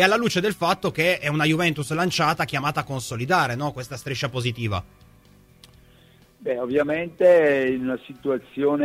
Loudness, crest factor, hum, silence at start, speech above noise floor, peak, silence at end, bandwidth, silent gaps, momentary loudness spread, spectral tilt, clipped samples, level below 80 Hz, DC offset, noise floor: -23 LUFS; 22 dB; none; 0 s; 31 dB; -2 dBFS; 0 s; 16 kHz; none; 11 LU; -5 dB/octave; under 0.1%; -54 dBFS; under 0.1%; -54 dBFS